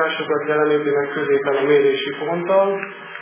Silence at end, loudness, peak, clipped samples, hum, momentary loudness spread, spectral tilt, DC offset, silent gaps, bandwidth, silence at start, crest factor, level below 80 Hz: 0 s; -19 LUFS; -4 dBFS; under 0.1%; none; 7 LU; -9 dB/octave; under 0.1%; none; 3.6 kHz; 0 s; 14 dB; -74 dBFS